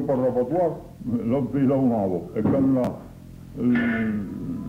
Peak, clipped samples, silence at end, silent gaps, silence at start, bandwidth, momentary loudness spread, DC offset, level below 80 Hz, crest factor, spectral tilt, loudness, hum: -12 dBFS; under 0.1%; 0 s; none; 0 s; 7.2 kHz; 13 LU; under 0.1%; -50 dBFS; 12 dB; -9.5 dB/octave; -24 LUFS; none